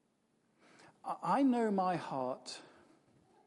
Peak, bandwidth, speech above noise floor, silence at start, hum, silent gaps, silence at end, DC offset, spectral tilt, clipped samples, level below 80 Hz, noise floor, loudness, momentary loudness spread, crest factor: -20 dBFS; 11.5 kHz; 42 dB; 1.05 s; none; none; 0.8 s; under 0.1%; -6 dB/octave; under 0.1%; -88 dBFS; -76 dBFS; -35 LUFS; 17 LU; 16 dB